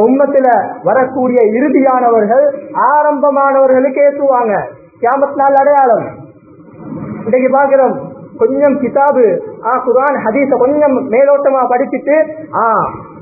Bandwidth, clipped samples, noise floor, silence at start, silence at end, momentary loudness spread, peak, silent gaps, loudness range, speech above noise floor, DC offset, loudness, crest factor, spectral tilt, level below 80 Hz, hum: 2.7 kHz; under 0.1%; -37 dBFS; 0 s; 0 s; 7 LU; 0 dBFS; none; 3 LU; 27 dB; under 0.1%; -11 LUFS; 10 dB; -11.5 dB/octave; -54 dBFS; none